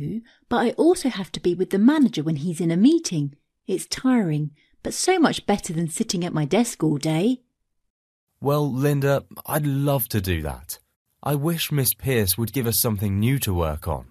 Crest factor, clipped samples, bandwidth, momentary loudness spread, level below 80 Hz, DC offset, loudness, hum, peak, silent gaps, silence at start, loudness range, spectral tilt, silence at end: 20 dB; under 0.1%; 14 kHz; 11 LU; -46 dBFS; under 0.1%; -22 LUFS; none; -4 dBFS; 7.90-8.27 s, 10.96-11.05 s; 0 s; 3 LU; -5.5 dB/octave; 0.05 s